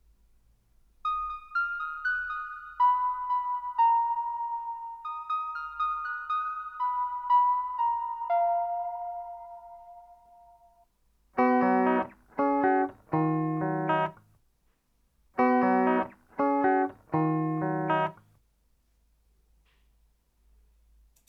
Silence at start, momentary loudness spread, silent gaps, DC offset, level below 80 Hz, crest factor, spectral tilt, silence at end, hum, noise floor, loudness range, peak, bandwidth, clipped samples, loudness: 1.05 s; 13 LU; none; under 0.1%; -64 dBFS; 16 dB; -9 dB/octave; 3.15 s; none; -70 dBFS; 5 LU; -14 dBFS; 5.8 kHz; under 0.1%; -28 LUFS